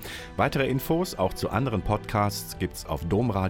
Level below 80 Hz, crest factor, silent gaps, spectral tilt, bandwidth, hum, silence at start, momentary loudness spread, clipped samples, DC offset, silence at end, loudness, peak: -42 dBFS; 16 dB; none; -6 dB/octave; 17 kHz; none; 0 s; 7 LU; under 0.1%; under 0.1%; 0 s; -27 LUFS; -10 dBFS